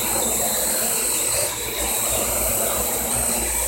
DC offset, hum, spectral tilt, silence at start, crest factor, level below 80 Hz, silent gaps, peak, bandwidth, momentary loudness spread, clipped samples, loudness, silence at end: under 0.1%; none; -1 dB/octave; 0 s; 14 dB; -38 dBFS; none; -8 dBFS; 16.5 kHz; 2 LU; under 0.1%; -19 LUFS; 0 s